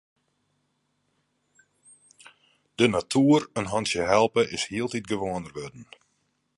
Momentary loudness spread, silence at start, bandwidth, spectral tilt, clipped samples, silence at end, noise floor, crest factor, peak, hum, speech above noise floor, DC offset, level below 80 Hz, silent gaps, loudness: 16 LU; 2.8 s; 11.5 kHz; -5 dB/octave; under 0.1%; 0.75 s; -74 dBFS; 22 dB; -6 dBFS; 50 Hz at -60 dBFS; 49 dB; under 0.1%; -58 dBFS; none; -24 LUFS